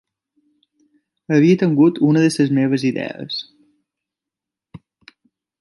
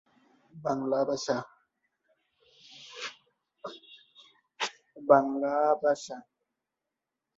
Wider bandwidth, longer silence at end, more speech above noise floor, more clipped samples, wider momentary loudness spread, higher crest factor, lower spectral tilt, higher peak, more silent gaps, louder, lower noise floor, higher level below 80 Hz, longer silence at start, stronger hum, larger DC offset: first, 11.5 kHz vs 8 kHz; second, 0.85 s vs 1.15 s; first, 71 dB vs 61 dB; neither; second, 13 LU vs 23 LU; second, 16 dB vs 26 dB; first, -6.5 dB/octave vs -4.5 dB/octave; first, -2 dBFS vs -6 dBFS; neither; first, -17 LUFS vs -29 LUFS; about the same, -86 dBFS vs -87 dBFS; first, -66 dBFS vs -76 dBFS; first, 1.3 s vs 0.55 s; neither; neither